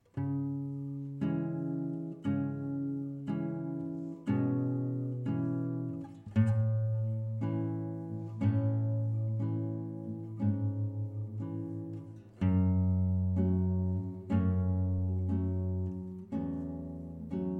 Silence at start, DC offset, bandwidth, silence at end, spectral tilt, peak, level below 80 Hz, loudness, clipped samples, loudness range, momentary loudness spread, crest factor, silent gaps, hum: 0.15 s; under 0.1%; 3.3 kHz; 0 s; -11 dB/octave; -16 dBFS; -56 dBFS; -34 LUFS; under 0.1%; 4 LU; 10 LU; 16 dB; none; none